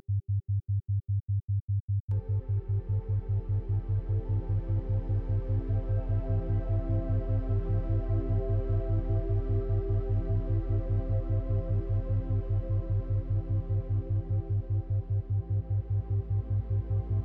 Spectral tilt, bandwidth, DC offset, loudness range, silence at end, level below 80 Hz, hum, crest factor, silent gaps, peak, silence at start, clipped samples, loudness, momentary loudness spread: -12.5 dB/octave; 2.3 kHz; under 0.1%; 1 LU; 0 s; -36 dBFS; none; 10 dB; 1.62-1.68 s, 1.80-1.88 s, 2.00-2.08 s; -18 dBFS; 0.1 s; under 0.1%; -31 LUFS; 1 LU